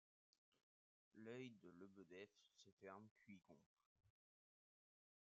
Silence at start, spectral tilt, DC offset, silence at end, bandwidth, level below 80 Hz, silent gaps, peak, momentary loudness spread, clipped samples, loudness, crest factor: 0.5 s; -5 dB/octave; under 0.1%; 1.2 s; 7.2 kHz; under -90 dBFS; 0.63-1.11 s, 2.72-2.77 s, 3.11-3.16 s, 3.66-3.77 s, 3.86-3.96 s; -44 dBFS; 10 LU; under 0.1%; -63 LUFS; 20 dB